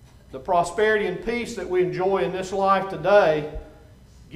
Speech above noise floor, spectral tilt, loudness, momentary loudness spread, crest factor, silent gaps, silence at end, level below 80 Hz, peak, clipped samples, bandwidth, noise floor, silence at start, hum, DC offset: 26 dB; -5.5 dB/octave; -22 LUFS; 14 LU; 18 dB; none; 0 s; -46 dBFS; -4 dBFS; under 0.1%; 13 kHz; -48 dBFS; 0.3 s; none; under 0.1%